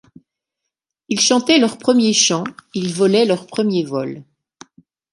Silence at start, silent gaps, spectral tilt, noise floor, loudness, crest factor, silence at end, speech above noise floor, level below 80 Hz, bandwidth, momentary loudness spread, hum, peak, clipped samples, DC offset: 1.1 s; none; -3.5 dB/octave; -81 dBFS; -16 LUFS; 18 dB; 0.9 s; 64 dB; -66 dBFS; 11.5 kHz; 12 LU; none; -2 dBFS; under 0.1%; under 0.1%